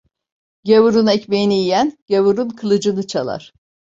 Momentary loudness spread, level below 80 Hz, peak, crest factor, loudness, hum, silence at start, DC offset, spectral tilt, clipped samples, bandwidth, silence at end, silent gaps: 10 LU; -58 dBFS; -2 dBFS; 16 dB; -16 LUFS; none; 0.65 s; under 0.1%; -5.5 dB/octave; under 0.1%; 7.8 kHz; 0.6 s; 2.02-2.06 s